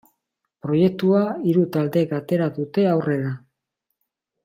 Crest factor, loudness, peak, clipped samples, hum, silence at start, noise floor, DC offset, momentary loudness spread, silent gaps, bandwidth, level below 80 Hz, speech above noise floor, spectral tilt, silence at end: 16 dB; -21 LUFS; -6 dBFS; under 0.1%; none; 0.65 s; -79 dBFS; under 0.1%; 7 LU; none; 16 kHz; -66 dBFS; 59 dB; -9 dB/octave; 1.05 s